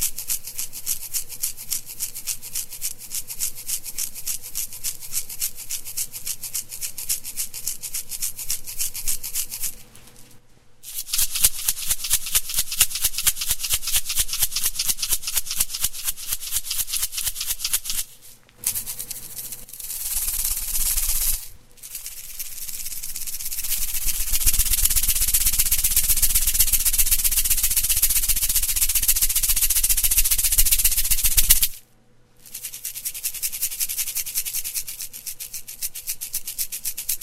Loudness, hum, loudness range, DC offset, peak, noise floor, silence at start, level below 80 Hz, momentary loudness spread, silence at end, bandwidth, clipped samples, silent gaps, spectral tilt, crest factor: -22 LUFS; none; 10 LU; under 0.1%; 0 dBFS; -54 dBFS; 0 s; -32 dBFS; 13 LU; 0 s; 16.5 kHz; under 0.1%; none; 1 dB/octave; 24 dB